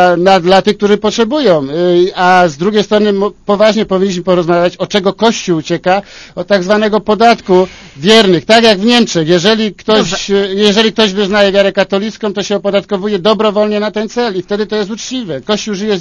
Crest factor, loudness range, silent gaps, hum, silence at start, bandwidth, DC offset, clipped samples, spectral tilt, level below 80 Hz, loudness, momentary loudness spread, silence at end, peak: 10 dB; 5 LU; none; none; 0 s; 11 kHz; under 0.1%; 0.7%; -4.5 dB/octave; -44 dBFS; -11 LUFS; 8 LU; 0 s; 0 dBFS